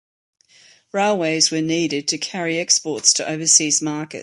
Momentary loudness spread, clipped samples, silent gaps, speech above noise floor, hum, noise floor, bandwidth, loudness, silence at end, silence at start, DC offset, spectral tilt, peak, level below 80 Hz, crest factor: 9 LU; under 0.1%; none; 32 dB; none; -52 dBFS; 11.5 kHz; -18 LUFS; 0 s; 0.95 s; under 0.1%; -2 dB/octave; 0 dBFS; -68 dBFS; 20 dB